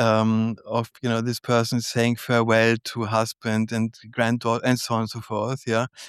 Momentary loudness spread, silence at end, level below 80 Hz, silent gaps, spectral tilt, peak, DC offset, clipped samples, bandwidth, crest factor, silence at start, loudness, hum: 8 LU; 0 s; -66 dBFS; none; -5.5 dB/octave; -6 dBFS; under 0.1%; under 0.1%; 14.5 kHz; 16 dB; 0 s; -23 LUFS; none